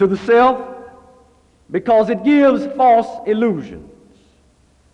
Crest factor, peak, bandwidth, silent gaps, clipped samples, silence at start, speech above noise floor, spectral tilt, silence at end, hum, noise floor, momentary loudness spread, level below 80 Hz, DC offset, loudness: 14 dB; -4 dBFS; 9 kHz; none; under 0.1%; 0 s; 40 dB; -7.5 dB/octave; 1.1 s; none; -54 dBFS; 14 LU; -52 dBFS; under 0.1%; -15 LUFS